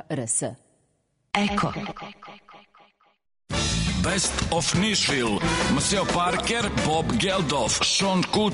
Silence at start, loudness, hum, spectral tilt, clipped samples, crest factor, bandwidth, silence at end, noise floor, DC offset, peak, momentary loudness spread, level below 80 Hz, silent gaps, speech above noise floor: 0.1 s; -23 LUFS; none; -3.5 dB/octave; under 0.1%; 16 dB; 11 kHz; 0 s; -70 dBFS; under 0.1%; -10 dBFS; 8 LU; -40 dBFS; none; 46 dB